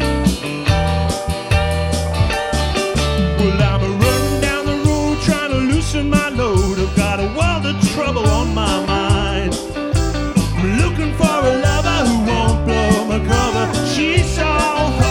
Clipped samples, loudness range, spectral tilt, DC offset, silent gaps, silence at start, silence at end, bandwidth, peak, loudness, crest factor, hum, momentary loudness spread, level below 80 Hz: under 0.1%; 2 LU; -5.5 dB/octave; under 0.1%; none; 0 s; 0 s; 17 kHz; 0 dBFS; -17 LUFS; 16 dB; none; 3 LU; -24 dBFS